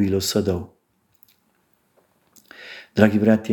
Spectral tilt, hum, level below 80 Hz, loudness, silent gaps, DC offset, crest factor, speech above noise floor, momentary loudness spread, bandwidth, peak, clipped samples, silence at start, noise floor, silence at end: -5.5 dB/octave; none; -56 dBFS; -20 LUFS; none; under 0.1%; 22 dB; 46 dB; 24 LU; 17.5 kHz; -2 dBFS; under 0.1%; 0 s; -65 dBFS; 0 s